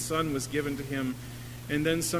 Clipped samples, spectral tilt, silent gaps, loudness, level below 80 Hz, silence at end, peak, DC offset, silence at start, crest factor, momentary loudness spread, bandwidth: under 0.1%; -4.5 dB/octave; none; -31 LUFS; -52 dBFS; 0 s; -14 dBFS; under 0.1%; 0 s; 18 dB; 12 LU; 16 kHz